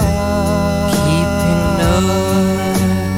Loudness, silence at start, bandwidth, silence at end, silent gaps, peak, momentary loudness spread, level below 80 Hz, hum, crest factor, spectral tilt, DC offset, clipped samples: -15 LUFS; 0 s; 16.5 kHz; 0 s; none; -6 dBFS; 2 LU; -26 dBFS; none; 10 dB; -6 dB/octave; under 0.1%; under 0.1%